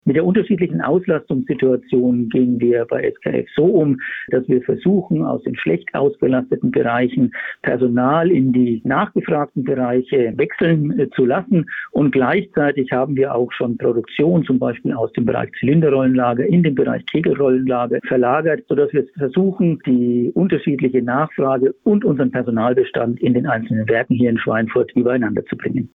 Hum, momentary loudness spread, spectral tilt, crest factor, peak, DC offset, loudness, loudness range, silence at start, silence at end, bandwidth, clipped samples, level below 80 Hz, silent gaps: none; 5 LU; -11 dB/octave; 10 dB; -6 dBFS; under 0.1%; -17 LUFS; 1 LU; 0.05 s; 0.1 s; 3.9 kHz; under 0.1%; -56 dBFS; none